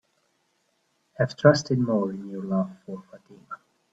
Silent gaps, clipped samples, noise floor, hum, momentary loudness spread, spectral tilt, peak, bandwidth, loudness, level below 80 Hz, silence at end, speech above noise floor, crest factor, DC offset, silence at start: none; under 0.1%; -71 dBFS; none; 23 LU; -6.5 dB/octave; -2 dBFS; 7.8 kHz; -24 LUFS; -66 dBFS; 0.4 s; 46 dB; 24 dB; under 0.1%; 1.2 s